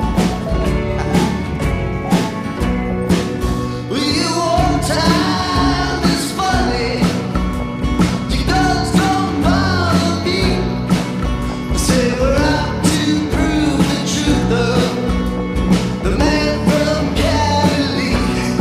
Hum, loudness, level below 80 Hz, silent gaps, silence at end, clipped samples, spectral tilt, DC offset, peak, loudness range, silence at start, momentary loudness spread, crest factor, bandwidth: none; -16 LUFS; -24 dBFS; none; 0 s; under 0.1%; -5.5 dB/octave; under 0.1%; -2 dBFS; 2 LU; 0 s; 5 LU; 14 dB; 15.5 kHz